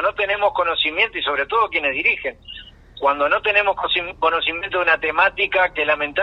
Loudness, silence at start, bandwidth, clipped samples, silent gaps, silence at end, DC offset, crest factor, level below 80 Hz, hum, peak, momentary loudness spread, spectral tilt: -18 LUFS; 0 s; 6.4 kHz; under 0.1%; none; 0 s; under 0.1%; 16 dB; -48 dBFS; none; -2 dBFS; 5 LU; -4.5 dB/octave